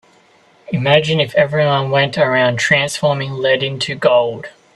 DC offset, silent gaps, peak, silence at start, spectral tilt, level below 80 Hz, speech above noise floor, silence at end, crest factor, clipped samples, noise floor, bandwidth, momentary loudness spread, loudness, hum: under 0.1%; none; 0 dBFS; 0.7 s; -4.5 dB/octave; -54 dBFS; 36 dB; 0.25 s; 16 dB; under 0.1%; -51 dBFS; 12 kHz; 7 LU; -15 LUFS; none